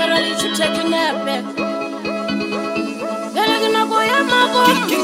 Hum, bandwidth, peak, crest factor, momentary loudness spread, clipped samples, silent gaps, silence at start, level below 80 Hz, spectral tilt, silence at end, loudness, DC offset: none; 16.5 kHz; -2 dBFS; 16 dB; 9 LU; under 0.1%; none; 0 s; -56 dBFS; -3 dB/octave; 0 s; -17 LUFS; under 0.1%